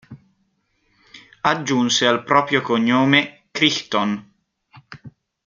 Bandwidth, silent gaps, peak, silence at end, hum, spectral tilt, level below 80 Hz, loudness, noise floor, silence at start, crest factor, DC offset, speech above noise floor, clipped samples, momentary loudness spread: 7.6 kHz; none; -2 dBFS; 0.4 s; none; -3.5 dB/octave; -64 dBFS; -18 LUFS; -67 dBFS; 0.1 s; 20 dB; under 0.1%; 49 dB; under 0.1%; 8 LU